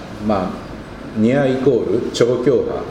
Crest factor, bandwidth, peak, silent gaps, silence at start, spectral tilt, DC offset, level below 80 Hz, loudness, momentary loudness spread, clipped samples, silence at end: 18 dB; 12 kHz; 0 dBFS; none; 0 s; -6.5 dB/octave; under 0.1%; -42 dBFS; -17 LUFS; 14 LU; under 0.1%; 0 s